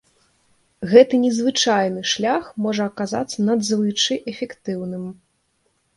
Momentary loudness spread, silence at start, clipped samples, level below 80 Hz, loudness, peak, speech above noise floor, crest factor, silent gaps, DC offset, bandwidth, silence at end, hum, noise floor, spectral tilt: 15 LU; 0.8 s; under 0.1%; -62 dBFS; -20 LUFS; 0 dBFS; 48 dB; 20 dB; none; under 0.1%; 11.5 kHz; 0.85 s; none; -67 dBFS; -4 dB/octave